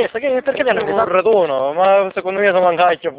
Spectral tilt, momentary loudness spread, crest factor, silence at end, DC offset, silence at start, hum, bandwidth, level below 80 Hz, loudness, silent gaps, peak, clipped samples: -8.5 dB/octave; 4 LU; 14 dB; 0 s; under 0.1%; 0 s; none; 4 kHz; -56 dBFS; -15 LUFS; none; 0 dBFS; under 0.1%